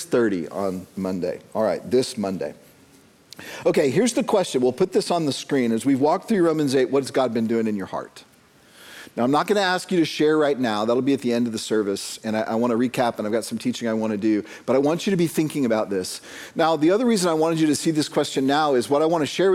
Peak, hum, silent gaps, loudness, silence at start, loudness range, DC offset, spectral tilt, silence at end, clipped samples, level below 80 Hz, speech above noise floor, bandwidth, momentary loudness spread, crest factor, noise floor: -6 dBFS; none; none; -22 LUFS; 0 s; 3 LU; under 0.1%; -5 dB/octave; 0 s; under 0.1%; -66 dBFS; 31 dB; 16 kHz; 8 LU; 16 dB; -53 dBFS